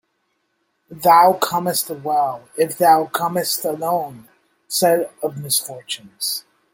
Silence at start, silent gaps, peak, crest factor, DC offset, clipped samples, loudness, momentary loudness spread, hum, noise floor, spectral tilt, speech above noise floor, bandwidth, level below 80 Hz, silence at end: 0.9 s; none; -2 dBFS; 18 dB; under 0.1%; under 0.1%; -19 LUFS; 13 LU; none; -70 dBFS; -3 dB/octave; 51 dB; 17 kHz; -66 dBFS; 0.35 s